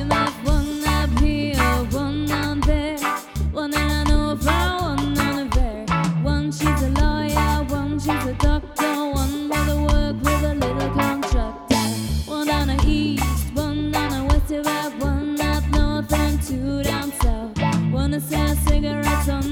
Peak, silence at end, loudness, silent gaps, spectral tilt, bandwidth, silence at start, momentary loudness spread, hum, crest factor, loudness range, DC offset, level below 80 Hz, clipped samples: -4 dBFS; 0 s; -22 LUFS; none; -5.5 dB/octave; 18 kHz; 0 s; 4 LU; none; 16 dB; 1 LU; under 0.1%; -24 dBFS; under 0.1%